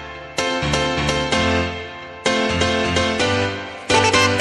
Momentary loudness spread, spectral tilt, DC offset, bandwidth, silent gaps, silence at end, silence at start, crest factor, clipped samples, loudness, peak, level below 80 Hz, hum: 11 LU; -3.5 dB/octave; under 0.1%; 11.5 kHz; none; 0 s; 0 s; 18 dB; under 0.1%; -19 LUFS; -2 dBFS; -38 dBFS; none